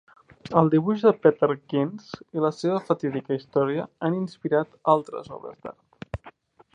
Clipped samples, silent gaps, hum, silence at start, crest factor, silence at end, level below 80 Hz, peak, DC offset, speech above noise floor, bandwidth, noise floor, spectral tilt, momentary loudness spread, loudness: under 0.1%; none; none; 0.45 s; 22 dB; 0.45 s; -56 dBFS; -4 dBFS; under 0.1%; 27 dB; 9.2 kHz; -51 dBFS; -8 dB/octave; 19 LU; -24 LUFS